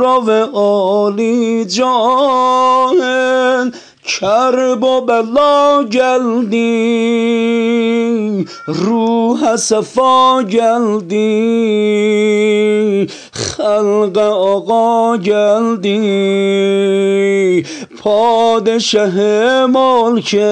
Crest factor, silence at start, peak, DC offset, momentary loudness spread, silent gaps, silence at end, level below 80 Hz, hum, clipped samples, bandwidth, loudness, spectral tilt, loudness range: 12 dB; 0 s; 0 dBFS; under 0.1%; 5 LU; none; 0 s; -58 dBFS; none; under 0.1%; 10 kHz; -12 LUFS; -4.5 dB/octave; 1 LU